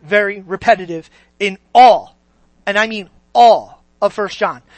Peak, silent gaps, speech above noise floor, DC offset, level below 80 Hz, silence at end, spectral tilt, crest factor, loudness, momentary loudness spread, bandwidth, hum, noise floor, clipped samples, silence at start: 0 dBFS; none; 41 dB; under 0.1%; -54 dBFS; 0.2 s; -4 dB/octave; 14 dB; -14 LUFS; 13 LU; 8.6 kHz; none; -54 dBFS; under 0.1%; 0.05 s